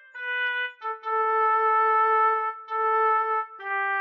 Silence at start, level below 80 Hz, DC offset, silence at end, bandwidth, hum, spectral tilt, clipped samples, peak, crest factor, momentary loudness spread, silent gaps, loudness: 0.15 s; under -90 dBFS; under 0.1%; 0 s; 5.6 kHz; none; -1 dB/octave; under 0.1%; -14 dBFS; 10 dB; 9 LU; none; -24 LUFS